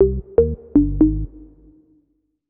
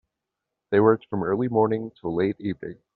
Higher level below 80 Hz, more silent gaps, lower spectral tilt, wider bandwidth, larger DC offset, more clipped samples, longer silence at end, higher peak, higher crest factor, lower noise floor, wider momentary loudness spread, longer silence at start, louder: first, -28 dBFS vs -62 dBFS; neither; first, -14 dB/octave vs -7 dB/octave; second, 2 kHz vs 4.4 kHz; neither; neither; first, 1.05 s vs 0.25 s; about the same, -2 dBFS vs -4 dBFS; about the same, 18 dB vs 20 dB; second, -66 dBFS vs -84 dBFS; about the same, 10 LU vs 11 LU; second, 0 s vs 0.7 s; first, -18 LUFS vs -24 LUFS